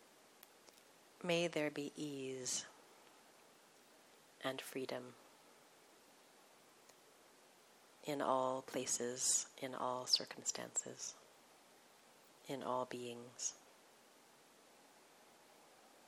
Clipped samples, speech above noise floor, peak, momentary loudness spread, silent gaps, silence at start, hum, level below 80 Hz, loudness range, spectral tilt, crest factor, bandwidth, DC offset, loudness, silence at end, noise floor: under 0.1%; 25 dB; -20 dBFS; 28 LU; none; 0 s; none; under -90 dBFS; 12 LU; -2 dB/octave; 26 dB; 17.5 kHz; under 0.1%; -41 LUFS; 0 s; -67 dBFS